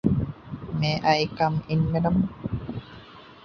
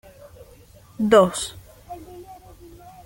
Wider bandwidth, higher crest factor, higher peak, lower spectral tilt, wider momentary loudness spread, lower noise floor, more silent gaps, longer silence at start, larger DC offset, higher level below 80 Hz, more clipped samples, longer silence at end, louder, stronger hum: second, 6.6 kHz vs 17 kHz; about the same, 18 dB vs 22 dB; second, -6 dBFS vs -2 dBFS; first, -7 dB/octave vs -4.5 dB/octave; second, 16 LU vs 26 LU; about the same, -46 dBFS vs -49 dBFS; neither; second, 0.05 s vs 1 s; neither; first, -44 dBFS vs -52 dBFS; neither; second, 0.1 s vs 0.7 s; second, -25 LUFS vs -19 LUFS; neither